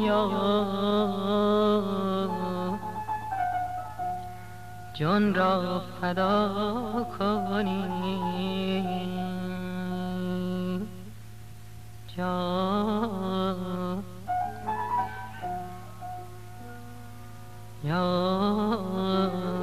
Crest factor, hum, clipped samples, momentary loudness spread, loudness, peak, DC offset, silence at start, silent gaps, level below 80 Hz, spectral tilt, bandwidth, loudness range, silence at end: 16 dB; none; under 0.1%; 19 LU; -29 LUFS; -12 dBFS; 0.6%; 0 s; none; -54 dBFS; -7 dB/octave; 15 kHz; 7 LU; 0 s